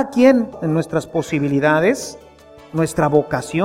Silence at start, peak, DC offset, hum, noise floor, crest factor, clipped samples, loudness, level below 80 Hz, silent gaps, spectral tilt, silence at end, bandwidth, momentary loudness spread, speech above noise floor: 0 s; -2 dBFS; under 0.1%; none; -43 dBFS; 16 dB; under 0.1%; -18 LUFS; -50 dBFS; none; -6.5 dB/octave; 0 s; 16 kHz; 9 LU; 26 dB